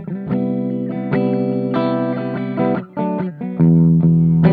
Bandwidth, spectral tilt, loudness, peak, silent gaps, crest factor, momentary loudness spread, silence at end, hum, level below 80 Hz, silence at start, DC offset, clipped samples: 4.6 kHz; -11.5 dB/octave; -17 LUFS; -2 dBFS; none; 14 dB; 10 LU; 0 s; none; -46 dBFS; 0 s; under 0.1%; under 0.1%